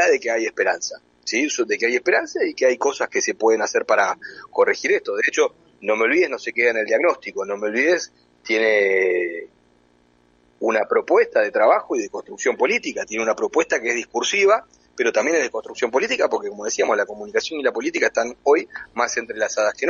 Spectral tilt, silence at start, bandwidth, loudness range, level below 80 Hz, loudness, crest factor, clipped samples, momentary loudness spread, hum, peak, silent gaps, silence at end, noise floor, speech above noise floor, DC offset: -2 dB/octave; 0 s; 7.6 kHz; 2 LU; -66 dBFS; -20 LUFS; 16 dB; under 0.1%; 8 LU; 60 Hz at -65 dBFS; -4 dBFS; none; 0 s; -58 dBFS; 38 dB; under 0.1%